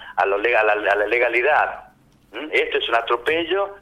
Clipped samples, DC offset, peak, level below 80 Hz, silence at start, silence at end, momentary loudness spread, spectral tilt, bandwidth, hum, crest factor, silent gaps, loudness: under 0.1%; under 0.1%; -6 dBFS; -56 dBFS; 0 s; 0.05 s; 8 LU; -4 dB/octave; 13 kHz; none; 16 dB; none; -19 LUFS